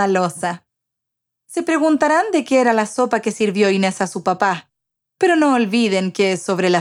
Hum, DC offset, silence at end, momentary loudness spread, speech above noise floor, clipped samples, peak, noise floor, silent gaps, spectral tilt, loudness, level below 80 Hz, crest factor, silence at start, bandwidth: none; under 0.1%; 0 s; 8 LU; 64 dB; under 0.1%; -2 dBFS; -80 dBFS; none; -5 dB/octave; -17 LUFS; -70 dBFS; 16 dB; 0 s; 13.5 kHz